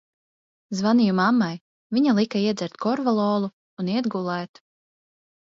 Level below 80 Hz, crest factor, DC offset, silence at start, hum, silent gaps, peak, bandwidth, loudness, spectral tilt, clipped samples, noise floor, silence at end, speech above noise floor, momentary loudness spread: -70 dBFS; 16 dB; under 0.1%; 0.7 s; none; 1.61-1.90 s, 3.53-3.77 s; -8 dBFS; 7.6 kHz; -23 LUFS; -6.5 dB/octave; under 0.1%; under -90 dBFS; 1.1 s; over 68 dB; 12 LU